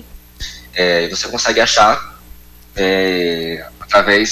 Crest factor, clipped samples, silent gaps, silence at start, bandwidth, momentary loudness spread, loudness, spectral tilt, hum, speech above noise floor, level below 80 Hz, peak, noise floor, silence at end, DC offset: 14 dB; under 0.1%; none; 0.15 s; 16 kHz; 19 LU; -14 LUFS; -2.5 dB/octave; 60 Hz at -40 dBFS; 26 dB; -40 dBFS; -2 dBFS; -40 dBFS; 0 s; under 0.1%